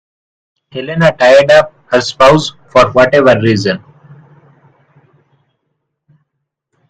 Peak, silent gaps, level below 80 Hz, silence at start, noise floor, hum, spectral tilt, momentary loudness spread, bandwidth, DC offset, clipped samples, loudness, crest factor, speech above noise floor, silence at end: 0 dBFS; none; -44 dBFS; 0.75 s; -72 dBFS; none; -5.5 dB/octave; 13 LU; 9.6 kHz; under 0.1%; 0.4%; -9 LUFS; 12 dB; 64 dB; 3.1 s